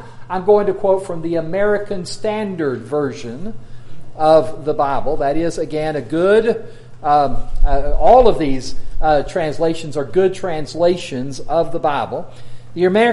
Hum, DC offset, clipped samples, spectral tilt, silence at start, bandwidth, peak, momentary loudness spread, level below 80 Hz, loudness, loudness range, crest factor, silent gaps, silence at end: none; under 0.1%; under 0.1%; -6 dB/octave; 0 s; 11.5 kHz; 0 dBFS; 12 LU; -26 dBFS; -18 LUFS; 4 LU; 16 dB; none; 0 s